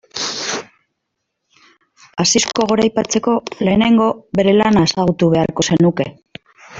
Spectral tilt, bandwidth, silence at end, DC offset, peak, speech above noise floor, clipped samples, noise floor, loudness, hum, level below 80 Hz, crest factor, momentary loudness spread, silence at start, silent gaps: -4.5 dB/octave; 8 kHz; 0 s; under 0.1%; -2 dBFS; 60 dB; under 0.1%; -75 dBFS; -15 LUFS; none; -48 dBFS; 16 dB; 10 LU; 0.15 s; none